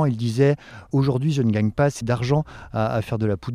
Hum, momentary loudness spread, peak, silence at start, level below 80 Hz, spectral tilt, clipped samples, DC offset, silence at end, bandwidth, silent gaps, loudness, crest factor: none; 6 LU; -6 dBFS; 0 s; -48 dBFS; -7.5 dB/octave; under 0.1%; under 0.1%; 0 s; 11.5 kHz; none; -22 LUFS; 14 dB